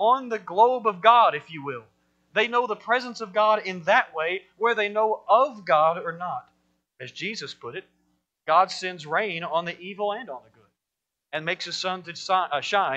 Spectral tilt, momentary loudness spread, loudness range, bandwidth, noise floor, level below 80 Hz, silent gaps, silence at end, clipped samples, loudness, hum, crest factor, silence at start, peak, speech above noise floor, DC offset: -3.5 dB/octave; 15 LU; 7 LU; 8.6 kHz; -85 dBFS; -78 dBFS; none; 0 s; under 0.1%; -24 LUFS; none; 22 dB; 0 s; -2 dBFS; 61 dB; under 0.1%